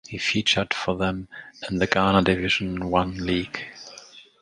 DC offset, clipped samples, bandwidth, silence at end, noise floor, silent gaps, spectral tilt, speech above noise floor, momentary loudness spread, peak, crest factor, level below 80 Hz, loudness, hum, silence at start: under 0.1%; under 0.1%; 10.5 kHz; 0.2 s; -47 dBFS; none; -4.5 dB/octave; 23 dB; 18 LU; 0 dBFS; 24 dB; -46 dBFS; -23 LUFS; none; 0.1 s